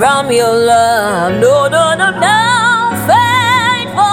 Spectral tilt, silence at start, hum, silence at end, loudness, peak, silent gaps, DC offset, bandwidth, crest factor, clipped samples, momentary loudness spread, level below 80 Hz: -3.5 dB/octave; 0 s; none; 0 s; -10 LUFS; 0 dBFS; none; under 0.1%; 16.5 kHz; 10 dB; under 0.1%; 3 LU; -46 dBFS